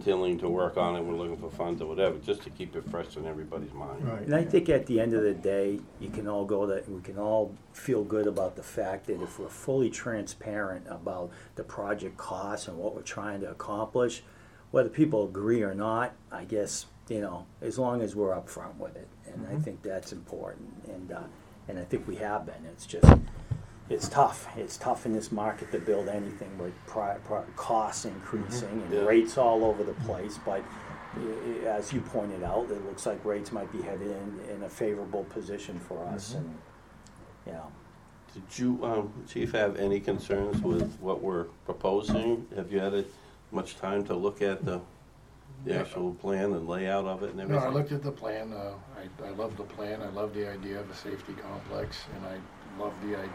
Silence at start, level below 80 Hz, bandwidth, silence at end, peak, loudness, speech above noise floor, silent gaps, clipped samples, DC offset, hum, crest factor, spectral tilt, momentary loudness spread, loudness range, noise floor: 0 s; -44 dBFS; 15.5 kHz; 0 s; 0 dBFS; -31 LUFS; 24 dB; none; under 0.1%; under 0.1%; none; 30 dB; -6.5 dB/octave; 14 LU; 11 LU; -54 dBFS